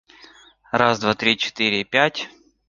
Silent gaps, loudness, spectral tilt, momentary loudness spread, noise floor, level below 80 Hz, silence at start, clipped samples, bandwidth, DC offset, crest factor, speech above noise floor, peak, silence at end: none; -19 LUFS; -4 dB/octave; 8 LU; -49 dBFS; -58 dBFS; 0.75 s; under 0.1%; 7.6 kHz; under 0.1%; 20 dB; 29 dB; -2 dBFS; 0.4 s